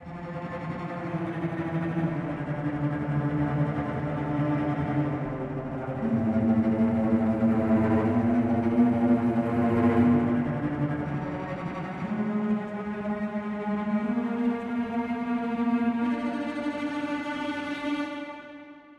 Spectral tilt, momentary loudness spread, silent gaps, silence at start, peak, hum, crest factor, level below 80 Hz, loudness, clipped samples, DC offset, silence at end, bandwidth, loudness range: -9 dB/octave; 10 LU; none; 0 s; -10 dBFS; none; 16 dB; -54 dBFS; -27 LUFS; under 0.1%; under 0.1%; 0.05 s; 6.8 kHz; 6 LU